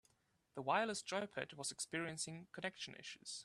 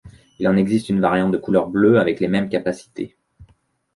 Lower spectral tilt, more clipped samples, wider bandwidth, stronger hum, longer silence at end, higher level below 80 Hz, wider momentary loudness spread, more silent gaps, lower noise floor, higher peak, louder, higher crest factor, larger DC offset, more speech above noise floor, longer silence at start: second, -2.5 dB/octave vs -7.5 dB/octave; neither; first, 14 kHz vs 11.5 kHz; neither; second, 0 s vs 0.5 s; second, -82 dBFS vs -52 dBFS; second, 11 LU vs 14 LU; neither; first, -79 dBFS vs -60 dBFS; second, -22 dBFS vs -2 dBFS; second, -43 LUFS vs -19 LUFS; first, 22 dB vs 16 dB; neither; second, 34 dB vs 42 dB; first, 0.55 s vs 0.05 s